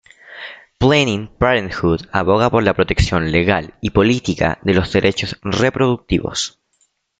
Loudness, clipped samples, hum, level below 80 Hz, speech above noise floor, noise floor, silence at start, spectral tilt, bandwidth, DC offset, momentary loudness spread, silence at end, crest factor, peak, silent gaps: -17 LUFS; under 0.1%; none; -34 dBFS; 47 dB; -64 dBFS; 0.3 s; -5.5 dB/octave; 9.4 kHz; under 0.1%; 8 LU; 0.7 s; 16 dB; 0 dBFS; none